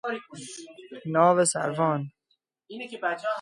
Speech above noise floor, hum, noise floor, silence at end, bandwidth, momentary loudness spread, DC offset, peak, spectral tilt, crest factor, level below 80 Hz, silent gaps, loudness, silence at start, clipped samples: 48 dB; none; -74 dBFS; 0 s; 11.5 kHz; 21 LU; under 0.1%; -6 dBFS; -4.5 dB/octave; 20 dB; -76 dBFS; none; -25 LUFS; 0.05 s; under 0.1%